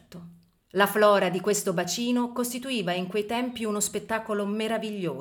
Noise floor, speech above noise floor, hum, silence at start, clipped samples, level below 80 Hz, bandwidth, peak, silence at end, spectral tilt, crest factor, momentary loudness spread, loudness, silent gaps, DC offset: -51 dBFS; 25 dB; none; 0.1 s; under 0.1%; -66 dBFS; 19 kHz; -6 dBFS; 0 s; -4 dB/octave; 20 dB; 10 LU; -26 LUFS; none; under 0.1%